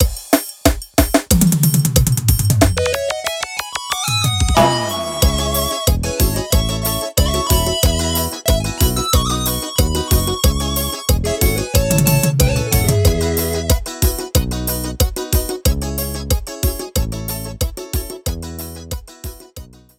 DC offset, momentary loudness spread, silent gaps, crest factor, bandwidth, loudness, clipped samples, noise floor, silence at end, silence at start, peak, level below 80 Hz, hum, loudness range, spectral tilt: under 0.1%; 10 LU; none; 16 dB; 18 kHz; -17 LUFS; under 0.1%; -38 dBFS; 0.3 s; 0 s; 0 dBFS; -22 dBFS; none; 5 LU; -4.5 dB/octave